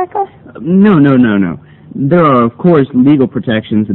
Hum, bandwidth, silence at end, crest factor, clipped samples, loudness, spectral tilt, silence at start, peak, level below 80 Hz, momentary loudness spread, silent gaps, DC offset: none; 4.2 kHz; 0 s; 10 dB; 0.5%; -10 LUFS; -11 dB/octave; 0 s; 0 dBFS; -46 dBFS; 13 LU; none; under 0.1%